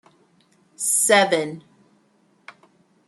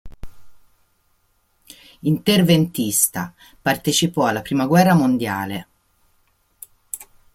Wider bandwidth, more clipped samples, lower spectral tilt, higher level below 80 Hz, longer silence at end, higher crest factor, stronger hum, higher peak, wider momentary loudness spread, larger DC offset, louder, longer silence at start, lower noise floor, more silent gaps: second, 13.5 kHz vs 16.5 kHz; neither; second, -1.5 dB/octave vs -4.5 dB/octave; second, -78 dBFS vs -52 dBFS; first, 1.5 s vs 0.3 s; about the same, 22 dB vs 20 dB; neither; about the same, -2 dBFS vs -2 dBFS; about the same, 17 LU vs 18 LU; neither; about the same, -19 LUFS vs -18 LUFS; first, 0.8 s vs 0.05 s; about the same, -61 dBFS vs -63 dBFS; neither